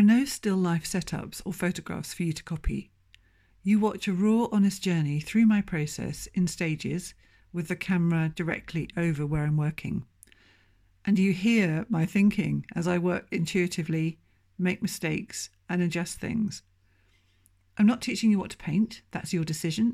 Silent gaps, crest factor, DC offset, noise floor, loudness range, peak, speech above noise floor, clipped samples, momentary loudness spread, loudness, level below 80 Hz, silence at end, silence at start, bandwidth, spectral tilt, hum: none; 16 dB; under 0.1%; -65 dBFS; 5 LU; -12 dBFS; 38 dB; under 0.1%; 11 LU; -28 LUFS; -50 dBFS; 0 s; 0 s; 15.5 kHz; -6 dB/octave; none